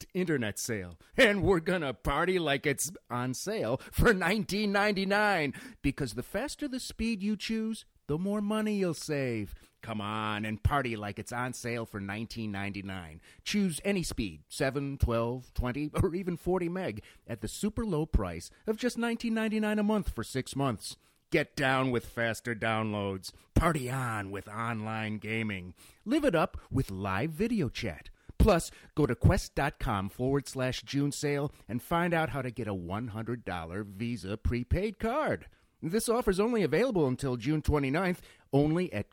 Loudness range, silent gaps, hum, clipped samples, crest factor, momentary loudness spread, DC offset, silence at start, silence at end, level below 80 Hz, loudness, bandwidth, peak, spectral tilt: 5 LU; none; none; under 0.1%; 22 dB; 10 LU; under 0.1%; 0 s; 0.1 s; -42 dBFS; -31 LUFS; 17.5 kHz; -10 dBFS; -5.5 dB/octave